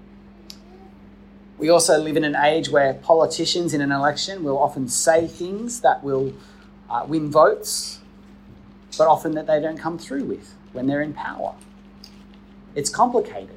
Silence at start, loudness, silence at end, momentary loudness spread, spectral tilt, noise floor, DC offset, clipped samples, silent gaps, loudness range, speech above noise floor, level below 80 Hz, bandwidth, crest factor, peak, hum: 0.5 s; -21 LUFS; 0 s; 14 LU; -3.5 dB/octave; -46 dBFS; under 0.1%; under 0.1%; none; 7 LU; 25 dB; -54 dBFS; 16 kHz; 20 dB; -2 dBFS; none